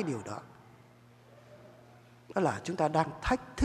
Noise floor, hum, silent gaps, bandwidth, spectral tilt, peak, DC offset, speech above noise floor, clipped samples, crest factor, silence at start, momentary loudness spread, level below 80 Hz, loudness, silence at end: -58 dBFS; none; none; 13.5 kHz; -6 dB/octave; -12 dBFS; under 0.1%; 27 dB; under 0.1%; 22 dB; 0 s; 25 LU; -52 dBFS; -33 LUFS; 0 s